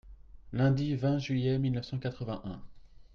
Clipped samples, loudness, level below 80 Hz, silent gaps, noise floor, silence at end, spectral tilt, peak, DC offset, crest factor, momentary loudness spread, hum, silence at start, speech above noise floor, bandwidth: under 0.1%; -32 LUFS; -54 dBFS; none; -50 dBFS; 0.1 s; -8 dB/octave; -16 dBFS; under 0.1%; 16 dB; 12 LU; none; 0.05 s; 20 dB; 6.6 kHz